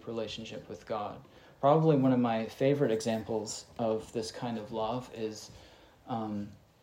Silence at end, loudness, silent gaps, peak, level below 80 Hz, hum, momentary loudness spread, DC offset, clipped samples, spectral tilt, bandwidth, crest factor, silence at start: 0.25 s; -32 LUFS; none; -12 dBFS; -66 dBFS; none; 16 LU; under 0.1%; under 0.1%; -6.5 dB/octave; 16 kHz; 20 dB; 0.05 s